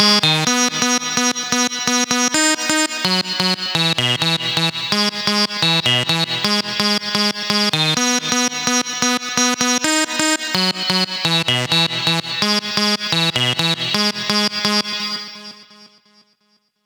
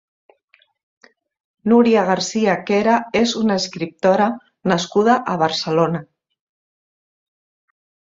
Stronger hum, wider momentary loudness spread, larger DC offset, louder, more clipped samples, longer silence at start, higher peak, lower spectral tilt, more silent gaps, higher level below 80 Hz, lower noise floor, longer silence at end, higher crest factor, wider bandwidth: neither; second, 3 LU vs 6 LU; neither; about the same, -16 LUFS vs -18 LUFS; neither; second, 0 s vs 1.65 s; about the same, 0 dBFS vs -2 dBFS; second, -2 dB/octave vs -5 dB/octave; neither; about the same, -62 dBFS vs -60 dBFS; first, -63 dBFS vs -59 dBFS; second, 1 s vs 2.05 s; about the same, 18 dB vs 18 dB; first, over 20 kHz vs 7.8 kHz